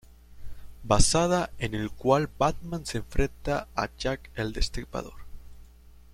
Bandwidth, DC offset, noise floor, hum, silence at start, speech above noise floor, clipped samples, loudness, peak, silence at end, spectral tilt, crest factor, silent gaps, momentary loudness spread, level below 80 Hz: 14.5 kHz; under 0.1%; -51 dBFS; none; 0.3 s; 25 dB; under 0.1%; -28 LUFS; -6 dBFS; 0.25 s; -4.5 dB/octave; 22 dB; none; 13 LU; -36 dBFS